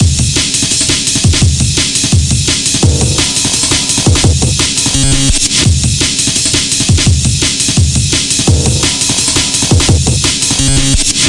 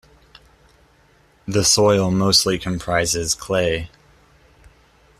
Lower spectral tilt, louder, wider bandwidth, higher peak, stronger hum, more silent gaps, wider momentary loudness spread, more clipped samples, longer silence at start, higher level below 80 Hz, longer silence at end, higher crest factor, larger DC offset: about the same, -3 dB/octave vs -3.5 dB/octave; first, -9 LUFS vs -18 LUFS; second, 11.5 kHz vs 14.5 kHz; about the same, 0 dBFS vs -2 dBFS; neither; neither; second, 1 LU vs 10 LU; neither; second, 0 s vs 1.45 s; first, -20 dBFS vs -46 dBFS; second, 0 s vs 1.35 s; second, 10 dB vs 20 dB; neither